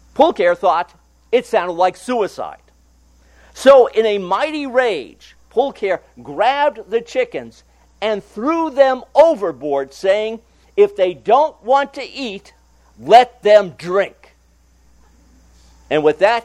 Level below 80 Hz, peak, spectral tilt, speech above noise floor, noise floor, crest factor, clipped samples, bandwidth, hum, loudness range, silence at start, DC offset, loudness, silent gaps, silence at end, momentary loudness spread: -54 dBFS; 0 dBFS; -4.5 dB/octave; 38 dB; -53 dBFS; 16 dB; under 0.1%; 12 kHz; none; 4 LU; 0.15 s; under 0.1%; -16 LUFS; none; 0.05 s; 15 LU